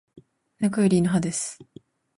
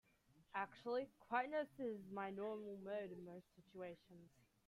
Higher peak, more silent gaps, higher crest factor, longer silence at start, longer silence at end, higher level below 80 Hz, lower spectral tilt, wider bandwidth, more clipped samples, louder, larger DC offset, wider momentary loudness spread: first, -10 dBFS vs -28 dBFS; neither; about the same, 16 dB vs 20 dB; second, 0.15 s vs 0.35 s; first, 0.55 s vs 0.4 s; first, -58 dBFS vs -84 dBFS; about the same, -6 dB/octave vs -6.5 dB/octave; second, 11.5 kHz vs 15.5 kHz; neither; first, -24 LUFS vs -48 LUFS; neither; second, 12 LU vs 17 LU